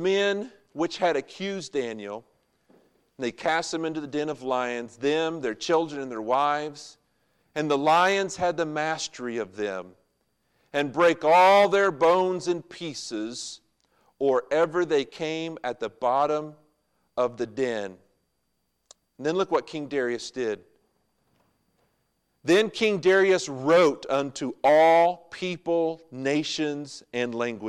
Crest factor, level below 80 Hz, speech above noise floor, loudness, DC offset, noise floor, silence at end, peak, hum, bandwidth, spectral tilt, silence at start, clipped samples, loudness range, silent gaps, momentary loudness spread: 16 dB; -70 dBFS; 51 dB; -25 LUFS; under 0.1%; -75 dBFS; 0 s; -10 dBFS; none; 13 kHz; -4.5 dB/octave; 0 s; under 0.1%; 9 LU; none; 14 LU